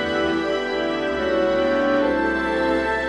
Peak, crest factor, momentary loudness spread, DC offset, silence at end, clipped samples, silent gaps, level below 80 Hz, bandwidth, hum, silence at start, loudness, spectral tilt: -8 dBFS; 12 dB; 4 LU; 0.2%; 0 s; under 0.1%; none; -44 dBFS; 10.5 kHz; none; 0 s; -21 LUFS; -5.5 dB/octave